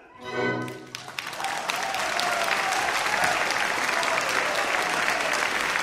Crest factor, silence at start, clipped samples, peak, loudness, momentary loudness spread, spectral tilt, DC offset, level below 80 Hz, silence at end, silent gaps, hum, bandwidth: 20 dB; 0 s; under 0.1%; -6 dBFS; -25 LUFS; 10 LU; -1.5 dB/octave; under 0.1%; -60 dBFS; 0 s; none; none; 16 kHz